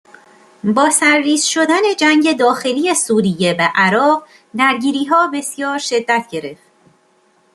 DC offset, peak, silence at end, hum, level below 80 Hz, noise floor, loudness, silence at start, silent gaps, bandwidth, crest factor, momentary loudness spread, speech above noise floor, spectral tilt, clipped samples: under 0.1%; -2 dBFS; 1 s; none; -62 dBFS; -56 dBFS; -14 LUFS; 0.65 s; none; 13 kHz; 14 dB; 9 LU; 41 dB; -3 dB/octave; under 0.1%